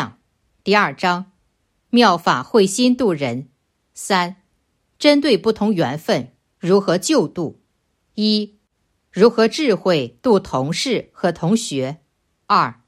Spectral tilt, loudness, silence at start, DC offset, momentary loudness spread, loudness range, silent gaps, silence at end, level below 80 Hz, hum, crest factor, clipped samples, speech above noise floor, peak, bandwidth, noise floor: -4.5 dB/octave; -18 LUFS; 0 s; under 0.1%; 13 LU; 2 LU; none; 0.15 s; -58 dBFS; none; 18 dB; under 0.1%; 51 dB; 0 dBFS; 14.5 kHz; -68 dBFS